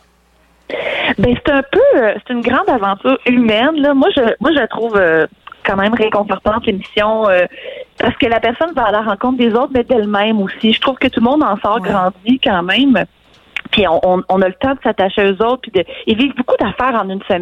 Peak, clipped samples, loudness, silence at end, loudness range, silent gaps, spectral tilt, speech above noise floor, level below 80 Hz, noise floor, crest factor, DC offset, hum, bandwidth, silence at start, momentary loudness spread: -2 dBFS; under 0.1%; -14 LUFS; 0 s; 2 LU; none; -7 dB/octave; 39 dB; -40 dBFS; -52 dBFS; 12 dB; under 0.1%; none; 7.6 kHz; 0.7 s; 6 LU